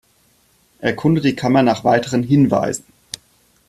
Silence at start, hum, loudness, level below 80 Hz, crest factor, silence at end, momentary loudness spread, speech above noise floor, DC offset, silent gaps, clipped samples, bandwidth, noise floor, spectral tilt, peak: 0.8 s; none; -17 LUFS; -52 dBFS; 16 dB; 0.9 s; 19 LU; 42 dB; under 0.1%; none; under 0.1%; 13.5 kHz; -58 dBFS; -6 dB/octave; -2 dBFS